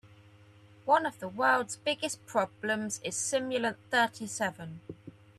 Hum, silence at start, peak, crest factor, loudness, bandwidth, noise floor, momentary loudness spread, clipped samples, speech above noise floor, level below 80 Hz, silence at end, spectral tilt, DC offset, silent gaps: none; 0.05 s; -12 dBFS; 20 dB; -30 LUFS; 14 kHz; -57 dBFS; 16 LU; under 0.1%; 26 dB; -74 dBFS; 0.3 s; -2.5 dB/octave; under 0.1%; none